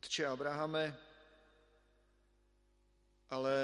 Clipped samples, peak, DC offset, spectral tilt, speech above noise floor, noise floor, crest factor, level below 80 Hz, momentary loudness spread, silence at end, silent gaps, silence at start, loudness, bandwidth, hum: under 0.1%; -22 dBFS; under 0.1%; -4 dB/octave; 35 dB; -73 dBFS; 18 dB; -74 dBFS; 8 LU; 0 s; none; 0.05 s; -39 LUFS; 11 kHz; 50 Hz at -75 dBFS